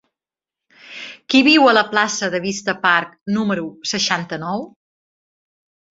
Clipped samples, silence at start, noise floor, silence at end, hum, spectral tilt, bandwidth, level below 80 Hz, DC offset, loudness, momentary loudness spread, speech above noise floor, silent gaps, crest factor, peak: under 0.1%; 0.85 s; -88 dBFS; 1.25 s; none; -3.5 dB/octave; 7.8 kHz; -62 dBFS; under 0.1%; -17 LUFS; 21 LU; 71 dB; 3.21-3.26 s; 18 dB; -2 dBFS